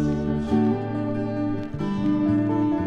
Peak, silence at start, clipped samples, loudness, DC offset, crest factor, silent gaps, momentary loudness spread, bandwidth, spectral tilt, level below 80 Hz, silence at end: -10 dBFS; 0 s; under 0.1%; -24 LUFS; under 0.1%; 12 dB; none; 6 LU; 7 kHz; -9 dB/octave; -42 dBFS; 0 s